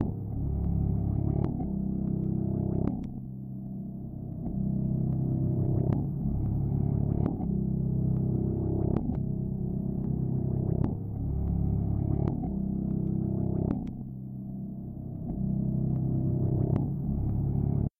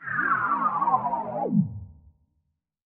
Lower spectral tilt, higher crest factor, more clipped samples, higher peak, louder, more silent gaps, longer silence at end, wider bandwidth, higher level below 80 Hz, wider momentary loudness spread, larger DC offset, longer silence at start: first, -14 dB/octave vs -7.5 dB/octave; about the same, 16 dB vs 18 dB; neither; about the same, -12 dBFS vs -10 dBFS; second, -31 LUFS vs -25 LUFS; neither; second, 0.1 s vs 0.9 s; second, 2.3 kHz vs 3.7 kHz; first, -38 dBFS vs -58 dBFS; first, 10 LU vs 7 LU; neither; about the same, 0 s vs 0 s